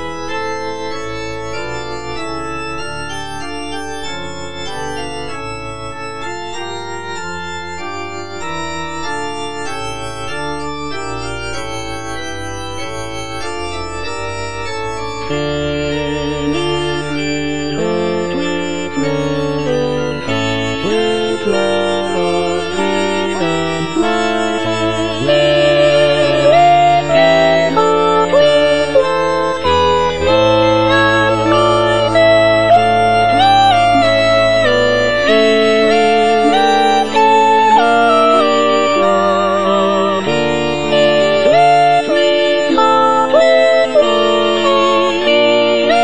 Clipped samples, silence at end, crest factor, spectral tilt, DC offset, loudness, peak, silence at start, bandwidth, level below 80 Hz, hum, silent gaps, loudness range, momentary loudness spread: under 0.1%; 0 s; 14 dB; -4.5 dB/octave; 3%; -13 LUFS; 0 dBFS; 0 s; 10.5 kHz; -40 dBFS; none; none; 13 LU; 14 LU